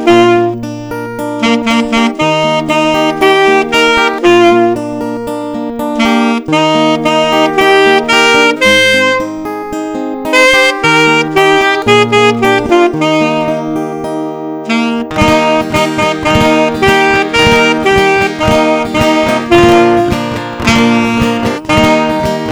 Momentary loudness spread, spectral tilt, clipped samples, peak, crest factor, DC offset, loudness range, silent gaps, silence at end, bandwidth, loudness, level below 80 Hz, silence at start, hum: 11 LU; -4.5 dB/octave; 1%; 0 dBFS; 10 dB; under 0.1%; 3 LU; none; 0 s; over 20 kHz; -9 LUFS; -34 dBFS; 0 s; none